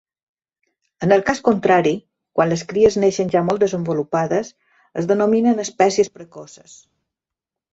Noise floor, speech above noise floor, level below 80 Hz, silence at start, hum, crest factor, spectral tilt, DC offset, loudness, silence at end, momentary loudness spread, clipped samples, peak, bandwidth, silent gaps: -86 dBFS; 68 dB; -56 dBFS; 1 s; none; 18 dB; -5.5 dB/octave; under 0.1%; -18 LUFS; 1.25 s; 12 LU; under 0.1%; -2 dBFS; 8 kHz; none